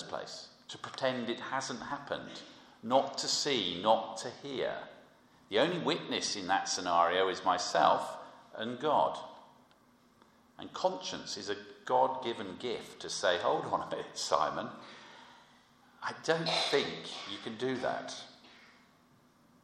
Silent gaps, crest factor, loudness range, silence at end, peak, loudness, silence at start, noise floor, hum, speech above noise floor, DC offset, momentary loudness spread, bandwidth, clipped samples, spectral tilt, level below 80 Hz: none; 24 dB; 6 LU; 1 s; -10 dBFS; -33 LUFS; 0 s; -65 dBFS; none; 32 dB; under 0.1%; 17 LU; 14 kHz; under 0.1%; -3 dB/octave; -76 dBFS